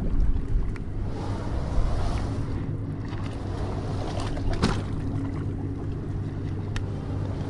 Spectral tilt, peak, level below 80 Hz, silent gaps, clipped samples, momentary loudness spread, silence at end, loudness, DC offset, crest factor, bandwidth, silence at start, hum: -7 dB/octave; -8 dBFS; -30 dBFS; none; under 0.1%; 5 LU; 0 s; -30 LUFS; under 0.1%; 20 dB; 11 kHz; 0 s; none